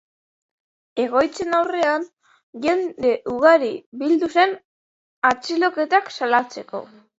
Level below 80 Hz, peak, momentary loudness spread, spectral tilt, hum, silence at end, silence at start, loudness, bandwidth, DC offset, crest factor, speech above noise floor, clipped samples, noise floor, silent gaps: -62 dBFS; -2 dBFS; 14 LU; -4 dB/octave; none; 0.35 s; 0.95 s; -20 LUFS; 8 kHz; under 0.1%; 20 dB; over 70 dB; under 0.1%; under -90 dBFS; 2.43-2.53 s, 3.86-3.92 s, 4.65-5.22 s